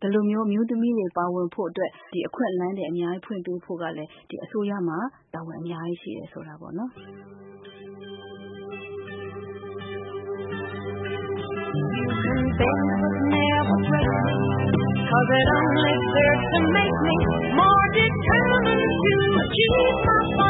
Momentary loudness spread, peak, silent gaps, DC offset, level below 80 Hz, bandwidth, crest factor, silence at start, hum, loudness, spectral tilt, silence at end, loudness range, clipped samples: 18 LU; -6 dBFS; none; under 0.1%; -42 dBFS; 4 kHz; 18 dB; 0 s; none; -22 LUFS; -11 dB/octave; 0 s; 17 LU; under 0.1%